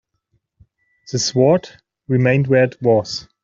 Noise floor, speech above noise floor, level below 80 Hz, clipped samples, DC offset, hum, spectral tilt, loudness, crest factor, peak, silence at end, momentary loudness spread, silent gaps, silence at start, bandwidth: -68 dBFS; 52 dB; -54 dBFS; under 0.1%; under 0.1%; none; -5.5 dB/octave; -17 LUFS; 16 dB; -2 dBFS; 0.2 s; 7 LU; none; 1.1 s; 7.6 kHz